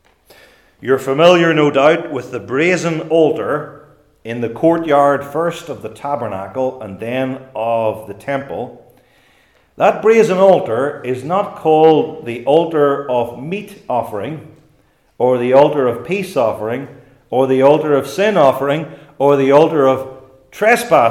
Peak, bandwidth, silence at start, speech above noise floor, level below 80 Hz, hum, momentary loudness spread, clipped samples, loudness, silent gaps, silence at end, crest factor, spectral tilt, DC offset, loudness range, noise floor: 0 dBFS; 15.5 kHz; 0.8 s; 41 dB; -58 dBFS; none; 15 LU; under 0.1%; -15 LUFS; none; 0 s; 16 dB; -6 dB/octave; under 0.1%; 7 LU; -55 dBFS